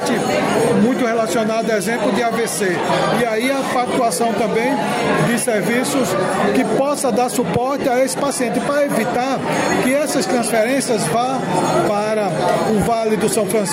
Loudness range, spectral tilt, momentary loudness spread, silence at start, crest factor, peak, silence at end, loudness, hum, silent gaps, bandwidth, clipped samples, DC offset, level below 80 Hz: 0 LU; -4.5 dB/octave; 2 LU; 0 s; 12 dB; -4 dBFS; 0 s; -17 LUFS; none; none; 16 kHz; under 0.1%; under 0.1%; -50 dBFS